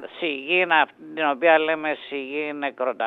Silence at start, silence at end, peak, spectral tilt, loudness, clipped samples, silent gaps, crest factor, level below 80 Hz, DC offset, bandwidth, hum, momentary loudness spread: 0 s; 0 s; -6 dBFS; -6 dB/octave; -22 LUFS; under 0.1%; none; 18 dB; -78 dBFS; under 0.1%; 4.5 kHz; none; 10 LU